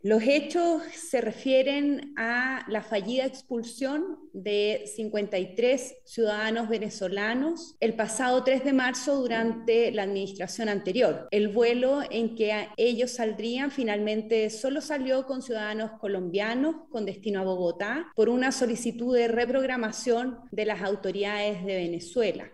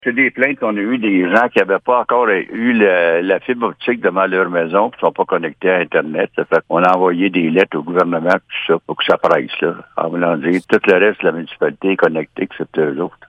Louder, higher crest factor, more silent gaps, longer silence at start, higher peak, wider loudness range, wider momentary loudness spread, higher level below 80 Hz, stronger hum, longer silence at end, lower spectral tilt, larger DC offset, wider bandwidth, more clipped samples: second, -28 LUFS vs -15 LUFS; about the same, 16 dB vs 16 dB; neither; about the same, 0.05 s vs 0.05 s; second, -12 dBFS vs 0 dBFS; about the same, 3 LU vs 2 LU; about the same, 8 LU vs 7 LU; about the same, -68 dBFS vs -64 dBFS; neither; second, 0.05 s vs 0.2 s; second, -4 dB/octave vs -7 dB/octave; first, 0.1% vs under 0.1%; first, 12.5 kHz vs 9.2 kHz; neither